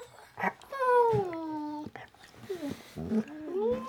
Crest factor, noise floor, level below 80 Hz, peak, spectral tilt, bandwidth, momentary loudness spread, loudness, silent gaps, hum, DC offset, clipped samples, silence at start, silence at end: 18 dB; -51 dBFS; -64 dBFS; -14 dBFS; -7 dB/octave; 18 kHz; 22 LU; -32 LUFS; none; none; under 0.1%; under 0.1%; 0 s; 0 s